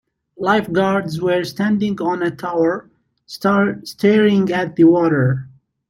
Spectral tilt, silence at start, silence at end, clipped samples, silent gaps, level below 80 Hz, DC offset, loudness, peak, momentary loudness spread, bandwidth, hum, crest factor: -7 dB/octave; 0.4 s; 0.4 s; under 0.1%; none; -56 dBFS; under 0.1%; -17 LUFS; -2 dBFS; 8 LU; 16 kHz; none; 16 dB